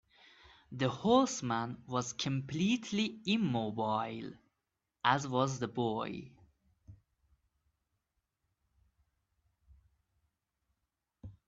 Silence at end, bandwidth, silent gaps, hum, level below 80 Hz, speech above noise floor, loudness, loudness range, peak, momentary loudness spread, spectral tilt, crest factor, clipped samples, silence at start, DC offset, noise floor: 0.15 s; 8 kHz; none; none; -70 dBFS; 53 dB; -34 LUFS; 10 LU; -12 dBFS; 13 LU; -5 dB/octave; 26 dB; under 0.1%; 0.7 s; under 0.1%; -87 dBFS